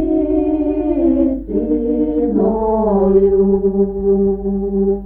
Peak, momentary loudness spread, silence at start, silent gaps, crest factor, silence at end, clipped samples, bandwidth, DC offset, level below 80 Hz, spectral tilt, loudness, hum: -2 dBFS; 5 LU; 0 s; none; 12 dB; 0 s; under 0.1%; 3.2 kHz; under 0.1%; -32 dBFS; -13.5 dB/octave; -16 LUFS; none